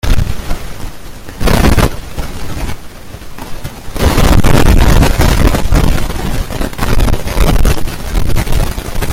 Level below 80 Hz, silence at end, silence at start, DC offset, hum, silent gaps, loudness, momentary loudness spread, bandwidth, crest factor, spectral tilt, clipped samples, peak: -14 dBFS; 0 s; 0.05 s; under 0.1%; none; none; -14 LUFS; 19 LU; 16.5 kHz; 10 dB; -5.5 dB/octave; 0.4%; 0 dBFS